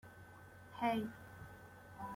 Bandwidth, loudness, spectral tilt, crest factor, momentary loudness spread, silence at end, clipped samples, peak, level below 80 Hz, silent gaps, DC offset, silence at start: 16.5 kHz; -41 LUFS; -6 dB/octave; 22 dB; 20 LU; 0 s; under 0.1%; -24 dBFS; -70 dBFS; none; under 0.1%; 0.05 s